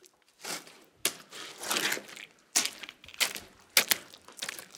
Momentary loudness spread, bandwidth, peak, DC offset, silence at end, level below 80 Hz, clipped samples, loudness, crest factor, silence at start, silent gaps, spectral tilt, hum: 18 LU; 18 kHz; -6 dBFS; under 0.1%; 0 s; -76 dBFS; under 0.1%; -30 LUFS; 30 dB; 0.4 s; none; 1 dB/octave; none